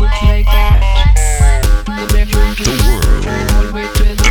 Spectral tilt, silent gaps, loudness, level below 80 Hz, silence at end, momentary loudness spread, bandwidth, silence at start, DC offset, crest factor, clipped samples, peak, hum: -4.5 dB/octave; none; -13 LUFS; -10 dBFS; 0 s; 4 LU; 19.5 kHz; 0 s; under 0.1%; 10 dB; under 0.1%; 0 dBFS; none